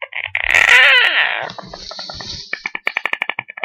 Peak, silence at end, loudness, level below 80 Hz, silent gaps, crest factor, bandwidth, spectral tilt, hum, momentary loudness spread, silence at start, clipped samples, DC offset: 0 dBFS; 0 s; -12 LUFS; -48 dBFS; none; 16 dB; 16.5 kHz; -0.5 dB/octave; none; 21 LU; 0 s; under 0.1%; under 0.1%